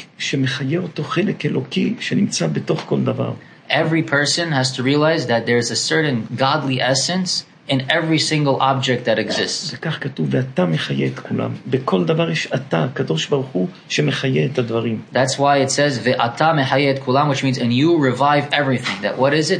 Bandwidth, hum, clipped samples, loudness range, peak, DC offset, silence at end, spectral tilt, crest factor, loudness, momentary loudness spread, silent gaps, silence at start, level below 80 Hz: 10.5 kHz; none; under 0.1%; 4 LU; 0 dBFS; under 0.1%; 0 s; -5 dB/octave; 18 dB; -18 LUFS; 6 LU; none; 0 s; -64 dBFS